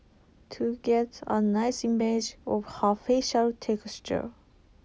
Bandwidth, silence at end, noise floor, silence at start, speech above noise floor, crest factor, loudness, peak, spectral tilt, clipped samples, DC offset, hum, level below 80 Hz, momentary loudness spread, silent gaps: 8 kHz; 0.55 s; -58 dBFS; 0.5 s; 31 dB; 18 dB; -28 LUFS; -12 dBFS; -5 dB/octave; under 0.1%; under 0.1%; none; -58 dBFS; 8 LU; none